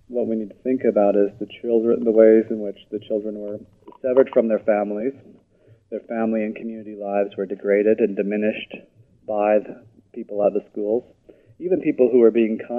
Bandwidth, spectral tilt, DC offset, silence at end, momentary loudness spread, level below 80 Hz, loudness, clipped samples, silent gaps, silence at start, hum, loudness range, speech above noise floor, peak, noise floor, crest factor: 3.6 kHz; -9.5 dB/octave; under 0.1%; 0 s; 17 LU; -66 dBFS; -21 LUFS; under 0.1%; none; 0.1 s; none; 5 LU; 35 dB; 0 dBFS; -55 dBFS; 20 dB